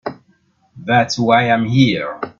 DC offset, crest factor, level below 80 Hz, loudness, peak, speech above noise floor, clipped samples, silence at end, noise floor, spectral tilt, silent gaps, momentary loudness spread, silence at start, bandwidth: under 0.1%; 16 dB; -54 dBFS; -15 LUFS; 0 dBFS; 43 dB; under 0.1%; 0.1 s; -58 dBFS; -6 dB/octave; none; 13 LU; 0.05 s; 7.4 kHz